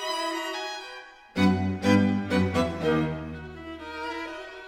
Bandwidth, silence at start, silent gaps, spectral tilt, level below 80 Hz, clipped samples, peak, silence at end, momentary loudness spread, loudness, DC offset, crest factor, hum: 15 kHz; 0 s; none; -6 dB/octave; -54 dBFS; under 0.1%; -8 dBFS; 0 s; 16 LU; -27 LUFS; under 0.1%; 20 dB; none